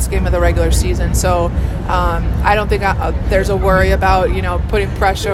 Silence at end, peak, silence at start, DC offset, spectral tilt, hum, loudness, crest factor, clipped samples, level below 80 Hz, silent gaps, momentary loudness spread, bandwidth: 0 s; 0 dBFS; 0 s; under 0.1%; -5.5 dB/octave; none; -15 LUFS; 14 dB; under 0.1%; -18 dBFS; none; 5 LU; 14 kHz